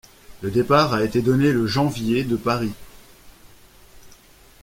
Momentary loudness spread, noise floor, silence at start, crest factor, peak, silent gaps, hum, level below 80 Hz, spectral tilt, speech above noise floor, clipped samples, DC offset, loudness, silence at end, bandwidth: 10 LU; -49 dBFS; 0.3 s; 20 dB; -4 dBFS; none; none; -48 dBFS; -6.5 dB/octave; 30 dB; under 0.1%; under 0.1%; -20 LUFS; 0.5 s; 16.5 kHz